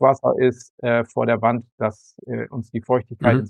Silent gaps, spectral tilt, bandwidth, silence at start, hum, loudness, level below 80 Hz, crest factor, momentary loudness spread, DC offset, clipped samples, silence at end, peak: 0.70-0.78 s, 1.72-1.78 s; -8 dB/octave; 9.4 kHz; 0 s; none; -22 LUFS; -54 dBFS; 18 dB; 10 LU; under 0.1%; under 0.1%; 0 s; -2 dBFS